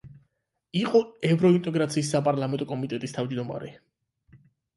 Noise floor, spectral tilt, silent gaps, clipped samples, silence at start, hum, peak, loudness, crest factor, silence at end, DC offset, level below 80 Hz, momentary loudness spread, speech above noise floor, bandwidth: -76 dBFS; -6.5 dB/octave; none; under 0.1%; 0.05 s; none; -8 dBFS; -26 LUFS; 18 dB; 1 s; under 0.1%; -66 dBFS; 11 LU; 51 dB; 11.5 kHz